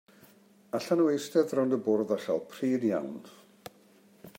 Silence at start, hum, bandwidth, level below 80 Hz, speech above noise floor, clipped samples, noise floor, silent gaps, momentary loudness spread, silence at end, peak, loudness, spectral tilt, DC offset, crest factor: 0.75 s; none; 16 kHz; -82 dBFS; 31 dB; under 0.1%; -60 dBFS; none; 23 LU; 0.1 s; -14 dBFS; -29 LUFS; -6 dB/octave; under 0.1%; 18 dB